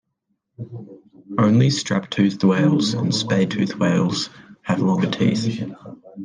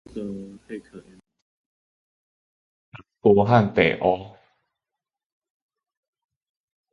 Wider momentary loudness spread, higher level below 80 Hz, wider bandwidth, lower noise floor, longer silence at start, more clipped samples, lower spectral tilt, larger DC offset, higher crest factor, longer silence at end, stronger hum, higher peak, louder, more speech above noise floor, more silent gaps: second, 19 LU vs 22 LU; second, -62 dBFS vs -56 dBFS; first, 9.8 kHz vs 6.8 kHz; second, -73 dBFS vs -88 dBFS; first, 0.6 s vs 0.15 s; neither; second, -6 dB/octave vs -8 dB/octave; neither; second, 16 dB vs 24 dB; second, 0 s vs 2.65 s; neither; second, -6 dBFS vs -2 dBFS; about the same, -20 LUFS vs -20 LUFS; second, 54 dB vs 67 dB; second, none vs 1.42-2.92 s